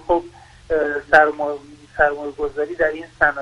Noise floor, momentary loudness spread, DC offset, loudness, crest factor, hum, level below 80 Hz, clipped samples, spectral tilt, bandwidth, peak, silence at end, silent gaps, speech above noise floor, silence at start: -41 dBFS; 12 LU; under 0.1%; -19 LUFS; 20 dB; none; -44 dBFS; under 0.1%; -5.5 dB/octave; 11 kHz; 0 dBFS; 0 s; none; 23 dB; 0.05 s